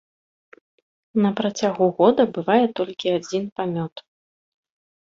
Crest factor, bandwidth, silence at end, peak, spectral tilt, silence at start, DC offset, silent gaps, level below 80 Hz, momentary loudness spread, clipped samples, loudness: 20 dB; 7.6 kHz; 1.15 s; -2 dBFS; -6 dB/octave; 1.15 s; under 0.1%; 3.52-3.56 s, 3.92-3.96 s; -66 dBFS; 10 LU; under 0.1%; -21 LUFS